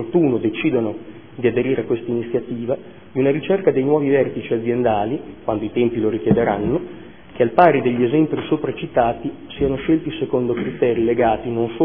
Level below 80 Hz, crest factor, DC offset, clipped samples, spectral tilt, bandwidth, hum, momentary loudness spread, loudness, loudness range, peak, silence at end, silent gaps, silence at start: -46 dBFS; 18 dB; 0.5%; under 0.1%; -11 dB/octave; 3.8 kHz; none; 8 LU; -19 LUFS; 3 LU; 0 dBFS; 0 s; none; 0 s